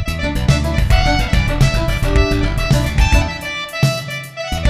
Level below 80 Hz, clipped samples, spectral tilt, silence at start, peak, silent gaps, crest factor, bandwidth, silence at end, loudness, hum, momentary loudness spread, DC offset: -18 dBFS; under 0.1%; -5.5 dB/octave; 0 s; 0 dBFS; none; 14 dB; 15 kHz; 0 s; -17 LUFS; none; 8 LU; under 0.1%